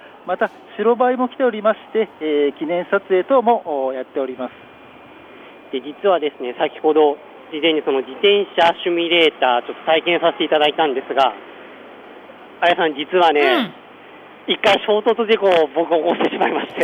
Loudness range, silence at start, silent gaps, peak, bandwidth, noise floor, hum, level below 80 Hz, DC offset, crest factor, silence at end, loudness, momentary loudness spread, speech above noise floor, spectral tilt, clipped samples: 5 LU; 0.05 s; none; -2 dBFS; 9.2 kHz; -42 dBFS; none; -70 dBFS; under 0.1%; 16 dB; 0 s; -18 LUFS; 10 LU; 24 dB; -5 dB/octave; under 0.1%